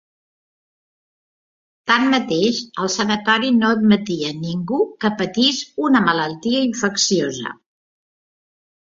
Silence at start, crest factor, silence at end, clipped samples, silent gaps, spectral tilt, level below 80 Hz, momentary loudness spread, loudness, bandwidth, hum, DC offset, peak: 1.85 s; 18 dB; 1.3 s; under 0.1%; none; -4 dB/octave; -60 dBFS; 8 LU; -18 LUFS; 7.8 kHz; none; under 0.1%; -2 dBFS